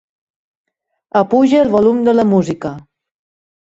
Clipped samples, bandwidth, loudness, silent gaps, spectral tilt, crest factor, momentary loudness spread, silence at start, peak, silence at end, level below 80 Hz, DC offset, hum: under 0.1%; 8 kHz; -13 LUFS; none; -7.5 dB/octave; 14 dB; 11 LU; 1.15 s; -2 dBFS; 0.9 s; -54 dBFS; under 0.1%; none